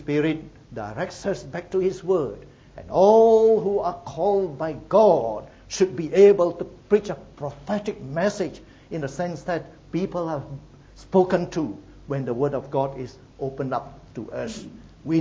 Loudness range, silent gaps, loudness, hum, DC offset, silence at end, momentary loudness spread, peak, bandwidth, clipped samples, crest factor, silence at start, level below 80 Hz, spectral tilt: 9 LU; none; -23 LUFS; none; under 0.1%; 0 s; 19 LU; -4 dBFS; 7.8 kHz; under 0.1%; 20 dB; 0 s; -52 dBFS; -6.5 dB/octave